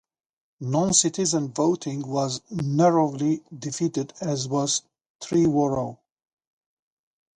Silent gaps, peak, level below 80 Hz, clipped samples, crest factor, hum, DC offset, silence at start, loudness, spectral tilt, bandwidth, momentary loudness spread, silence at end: 5.06-5.19 s; -6 dBFS; -60 dBFS; under 0.1%; 20 dB; none; under 0.1%; 0.6 s; -24 LUFS; -5 dB/octave; 11 kHz; 10 LU; 1.4 s